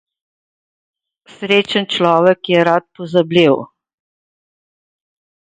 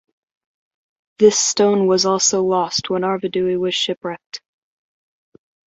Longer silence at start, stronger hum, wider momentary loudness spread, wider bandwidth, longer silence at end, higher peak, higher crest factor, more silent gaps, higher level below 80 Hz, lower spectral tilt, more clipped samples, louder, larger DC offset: first, 1.4 s vs 1.2 s; neither; second, 6 LU vs 14 LU; first, 9.4 kHz vs 8.2 kHz; first, 1.9 s vs 1.3 s; about the same, 0 dBFS vs -2 dBFS; about the same, 18 dB vs 18 dB; second, none vs 3.97-4.01 s, 4.26-4.30 s; about the same, -62 dBFS vs -62 dBFS; first, -6 dB/octave vs -3 dB/octave; neither; first, -14 LUFS vs -17 LUFS; neither